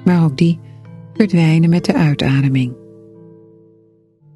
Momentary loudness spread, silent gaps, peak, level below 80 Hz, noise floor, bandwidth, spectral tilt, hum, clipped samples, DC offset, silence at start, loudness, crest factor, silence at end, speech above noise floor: 10 LU; none; 0 dBFS; -48 dBFS; -52 dBFS; 11.5 kHz; -8 dB/octave; none; under 0.1%; under 0.1%; 0 s; -15 LUFS; 16 dB; 1.6 s; 39 dB